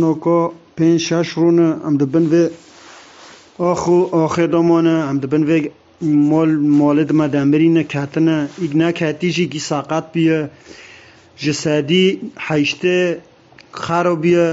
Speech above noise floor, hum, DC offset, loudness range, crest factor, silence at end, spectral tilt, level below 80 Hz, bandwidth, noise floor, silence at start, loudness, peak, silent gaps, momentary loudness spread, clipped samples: 28 dB; none; under 0.1%; 4 LU; 14 dB; 0 s; -6 dB/octave; -58 dBFS; 8 kHz; -43 dBFS; 0 s; -16 LUFS; -2 dBFS; none; 7 LU; under 0.1%